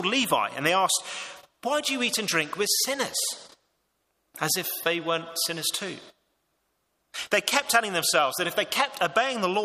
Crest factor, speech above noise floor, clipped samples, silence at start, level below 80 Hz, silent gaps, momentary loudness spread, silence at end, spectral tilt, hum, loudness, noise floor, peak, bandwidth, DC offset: 22 dB; 48 dB; under 0.1%; 0 s; -74 dBFS; none; 13 LU; 0 s; -1.5 dB/octave; none; -25 LUFS; -75 dBFS; -4 dBFS; 15.5 kHz; under 0.1%